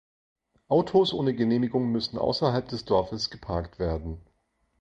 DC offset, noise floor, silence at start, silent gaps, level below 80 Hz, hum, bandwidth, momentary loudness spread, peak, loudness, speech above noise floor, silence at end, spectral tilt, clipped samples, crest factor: under 0.1%; -72 dBFS; 0.7 s; none; -46 dBFS; none; 8.4 kHz; 10 LU; -8 dBFS; -27 LUFS; 46 dB; 0.6 s; -6.5 dB/octave; under 0.1%; 18 dB